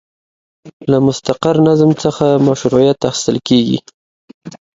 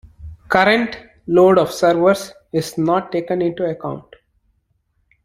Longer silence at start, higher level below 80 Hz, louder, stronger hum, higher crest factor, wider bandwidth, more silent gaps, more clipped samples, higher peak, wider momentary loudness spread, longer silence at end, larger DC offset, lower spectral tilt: first, 0.65 s vs 0.2 s; about the same, -48 dBFS vs -50 dBFS; first, -13 LUFS vs -17 LUFS; neither; about the same, 14 dB vs 18 dB; second, 7.8 kHz vs 15.5 kHz; first, 0.73-0.80 s, 3.94-4.28 s, 4.34-4.41 s vs none; neither; about the same, 0 dBFS vs 0 dBFS; second, 6 LU vs 13 LU; second, 0.2 s vs 1.25 s; neither; about the same, -6 dB/octave vs -5.5 dB/octave